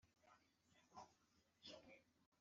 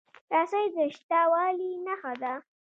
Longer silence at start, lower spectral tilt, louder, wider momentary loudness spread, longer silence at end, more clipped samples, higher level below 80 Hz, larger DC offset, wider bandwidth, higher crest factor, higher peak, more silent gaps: second, 0 s vs 0.3 s; second, -1.5 dB/octave vs -4.5 dB/octave; second, -65 LUFS vs -28 LUFS; second, 7 LU vs 10 LU; second, 0 s vs 0.3 s; neither; about the same, under -90 dBFS vs -88 dBFS; neither; about the same, 7.4 kHz vs 7.6 kHz; about the same, 22 dB vs 18 dB; second, -48 dBFS vs -12 dBFS; about the same, 2.26-2.32 s vs 1.03-1.09 s